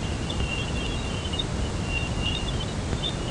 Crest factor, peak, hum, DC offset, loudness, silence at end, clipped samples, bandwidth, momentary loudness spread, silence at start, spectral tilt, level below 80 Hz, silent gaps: 16 dB; -12 dBFS; none; 0.2%; -28 LUFS; 0 s; under 0.1%; 11 kHz; 2 LU; 0 s; -4.5 dB/octave; -34 dBFS; none